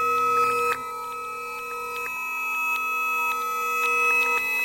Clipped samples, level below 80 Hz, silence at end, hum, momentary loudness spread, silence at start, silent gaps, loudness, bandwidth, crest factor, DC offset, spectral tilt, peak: under 0.1%; -64 dBFS; 0 s; none; 12 LU; 0 s; none; -24 LUFS; 16 kHz; 16 dB; under 0.1%; -1 dB/octave; -10 dBFS